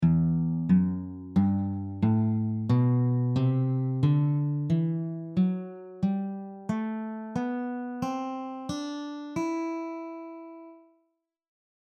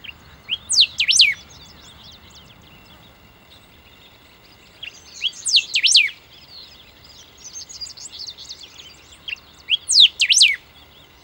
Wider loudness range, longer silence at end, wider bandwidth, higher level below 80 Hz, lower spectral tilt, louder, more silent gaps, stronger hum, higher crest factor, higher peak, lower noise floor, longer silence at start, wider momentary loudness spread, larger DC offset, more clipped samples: second, 9 LU vs 17 LU; first, 1.15 s vs 0.65 s; second, 7.8 kHz vs 18.5 kHz; about the same, -56 dBFS vs -58 dBFS; first, -9 dB/octave vs 3 dB/octave; second, -28 LUFS vs -14 LUFS; neither; neither; second, 16 dB vs 22 dB; second, -12 dBFS vs 0 dBFS; first, -76 dBFS vs -49 dBFS; second, 0 s vs 0.5 s; second, 12 LU vs 25 LU; neither; neither